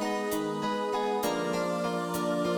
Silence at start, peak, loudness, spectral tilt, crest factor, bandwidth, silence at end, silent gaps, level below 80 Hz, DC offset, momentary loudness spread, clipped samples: 0 s; -18 dBFS; -30 LUFS; -5 dB/octave; 12 dB; 19 kHz; 0 s; none; -66 dBFS; under 0.1%; 2 LU; under 0.1%